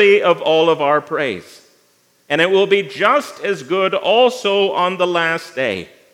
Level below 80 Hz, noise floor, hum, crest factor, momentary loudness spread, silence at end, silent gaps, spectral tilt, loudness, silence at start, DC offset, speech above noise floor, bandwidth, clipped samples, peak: -72 dBFS; -57 dBFS; none; 16 dB; 8 LU; 0.3 s; none; -4.5 dB/octave; -16 LUFS; 0 s; under 0.1%; 41 dB; 13.5 kHz; under 0.1%; 0 dBFS